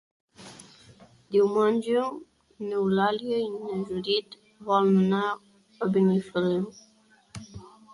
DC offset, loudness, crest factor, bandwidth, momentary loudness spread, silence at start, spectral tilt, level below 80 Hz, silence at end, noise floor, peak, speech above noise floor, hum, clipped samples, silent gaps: under 0.1%; -26 LUFS; 16 dB; 11.5 kHz; 23 LU; 0.4 s; -7 dB/octave; -66 dBFS; 0.3 s; -54 dBFS; -10 dBFS; 29 dB; none; under 0.1%; none